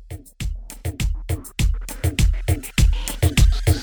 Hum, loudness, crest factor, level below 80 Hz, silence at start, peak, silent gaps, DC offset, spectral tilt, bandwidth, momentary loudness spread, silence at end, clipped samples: none; -23 LUFS; 14 dB; -22 dBFS; 0 s; -6 dBFS; none; 0.2%; -5 dB/octave; over 20 kHz; 13 LU; 0 s; under 0.1%